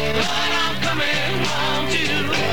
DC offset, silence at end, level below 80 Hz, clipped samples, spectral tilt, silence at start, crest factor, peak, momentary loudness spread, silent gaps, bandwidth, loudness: 5%; 0 s; -42 dBFS; under 0.1%; -3.5 dB/octave; 0 s; 14 dB; -6 dBFS; 1 LU; none; 19 kHz; -20 LUFS